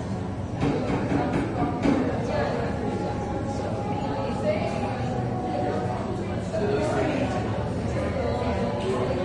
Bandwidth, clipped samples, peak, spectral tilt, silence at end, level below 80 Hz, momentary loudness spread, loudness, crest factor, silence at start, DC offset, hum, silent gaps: 11 kHz; under 0.1%; -10 dBFS; -7.5 dB/octave; 0 s; -42 dBFS; 4 LU; -27 LUFS; 16 dB; 0 s; under 0.1%; none; none